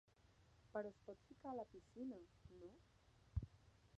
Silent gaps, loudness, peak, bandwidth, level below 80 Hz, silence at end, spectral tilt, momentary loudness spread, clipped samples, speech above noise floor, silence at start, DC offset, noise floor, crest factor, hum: none; -55 LUFS; -32 dBFS; 8.4 kHz; -64 dBFS; 0 s; -8.5 dB/octave; 12 LU; under 0.1%; 18 dB; 0.3 s; under 0.1%; -73 dBFS; 24 dB; none